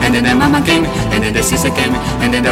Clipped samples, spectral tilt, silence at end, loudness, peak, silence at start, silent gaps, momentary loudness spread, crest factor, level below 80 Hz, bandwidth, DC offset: under 0.1%; -4.5 dB/octave; 0 s; -13 LUFS; 0 dBFS; 0 s; none; 4 LU; 12 dB; -28 dBFS; 16.5 kHz; under 0.1%